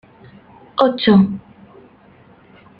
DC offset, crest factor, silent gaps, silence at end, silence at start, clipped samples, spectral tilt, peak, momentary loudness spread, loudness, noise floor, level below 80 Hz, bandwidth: under 0.1%; 18 dB; none; 1.4 s; 0.75 s; under 0.1%; -9.5 dB/octave; -2 dBFS; 15 LU; -15 LUFS; -48 dBFS; -54 dBFS; 5.2 kHz